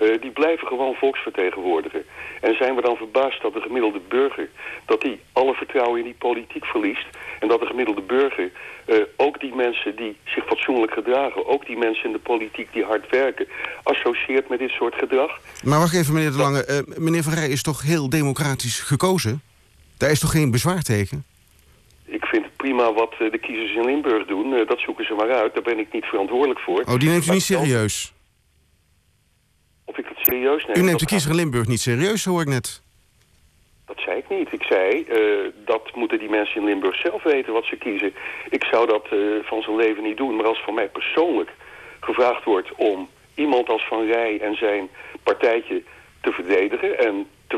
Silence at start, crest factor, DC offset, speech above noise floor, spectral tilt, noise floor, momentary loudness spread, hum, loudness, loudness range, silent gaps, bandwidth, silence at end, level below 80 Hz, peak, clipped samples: 0 s; 16 dB; under 0.1%; 41 dB; -5 dB/octave; -62 dBFS; 8 LU; none; -21 LUFS; 3 LU; none; 14.5 kHz; 0 s; -52 dBFS; -6 dBFS; under 0.1%